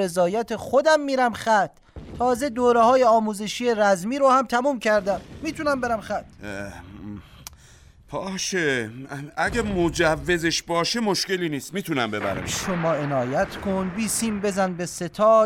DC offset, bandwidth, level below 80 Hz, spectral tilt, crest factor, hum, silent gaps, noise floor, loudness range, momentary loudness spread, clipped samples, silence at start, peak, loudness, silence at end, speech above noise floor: under 0.1%; 16.5 kHz; -48 dBFS; -4 dB/octave; 16 dB; none; none; -50 dBFS; 9 LU; 15 LU; under 0.1%; 0 s; -6 dBFS; -23 LUFS; 0 s; 28 dB